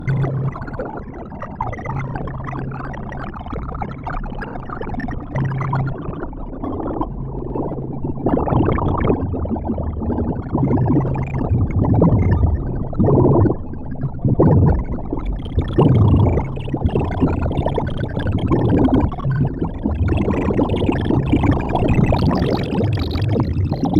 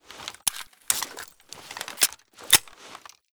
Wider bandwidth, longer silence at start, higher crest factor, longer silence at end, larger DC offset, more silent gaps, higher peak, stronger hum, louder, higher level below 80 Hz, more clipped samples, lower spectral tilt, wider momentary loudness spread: second, 6.2 kHz vs over 20 kHz; about the same, 0 s vs 0.1 s; second, 16 dB vs 30 dB; second, 0 s vs 0.35 s; neither; neither; about the same, -2 dBFS vs 0 dBFS; neither; first, -19 LUFS vs -23 LUFS; first, -28 dBFS vs -60 dBFS; neither; first, -10 dB/octave vs 1.5 dB/octave; second, 13 LU vs 25 LU